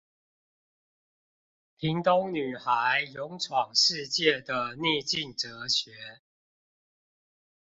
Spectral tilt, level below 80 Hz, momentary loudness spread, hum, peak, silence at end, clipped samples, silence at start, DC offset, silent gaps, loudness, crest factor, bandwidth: -3 dB/octave; -68 dBFS; 11 LU; none; -8 dBFS; 1.6 s; under 0.1%; 1.8 s; under 0.1%; none; -27 LUFS; 22 dB; 8 kHz